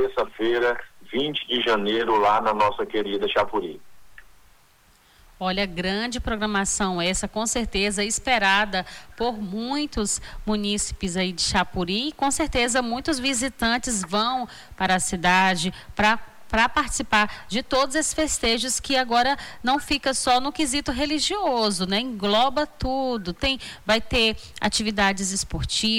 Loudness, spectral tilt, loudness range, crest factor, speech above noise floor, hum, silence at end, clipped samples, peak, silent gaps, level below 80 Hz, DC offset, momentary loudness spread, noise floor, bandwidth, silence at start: -23 LUFS; -3 dB/octave; 4 LU; 14 dB; 34 dB; none; 0 s; under 0.1%; -8 dBFS; none; -42 dBFS; under 0.1%; 7 LU; -57 dBFS; 19 kHz; 0 s